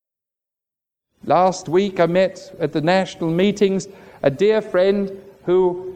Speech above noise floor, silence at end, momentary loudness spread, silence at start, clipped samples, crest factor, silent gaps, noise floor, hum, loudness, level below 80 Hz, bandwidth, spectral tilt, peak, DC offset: 69 dB; 0 s; 9 LU; 1.25 s; under 0.1%; 18 dB; none; -87 dBFS; none; -19 LUFS; -58 dBFS; 9.2 kHz; -6 dB/octave; -2 dBFS; under 0.1%